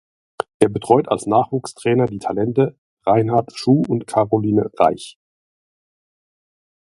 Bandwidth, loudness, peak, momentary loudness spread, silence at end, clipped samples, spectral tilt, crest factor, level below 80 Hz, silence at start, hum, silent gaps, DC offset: 11.5 kHz; -18 LUFS; 0 dBFS; 8 LU; 1.75 s; under 0.1%; -7 dB/octave; 20 dB; -54 dBFS; 0.6 s; none; 2.78-2.97 s; under 0.1%